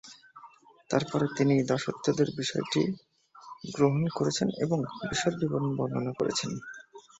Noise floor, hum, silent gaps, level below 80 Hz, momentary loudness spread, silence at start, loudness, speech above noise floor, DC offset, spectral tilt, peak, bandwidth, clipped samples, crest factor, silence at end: -55 dBFS; none; none; -64 dBFS; 16 LU; 0.05 s; -29 LUFS; 26 dB; under 0.1%; -5.5 dB/octave; -10 dBFS; 8.2 kHz; under 0.1%; 20 dB; 0.2 s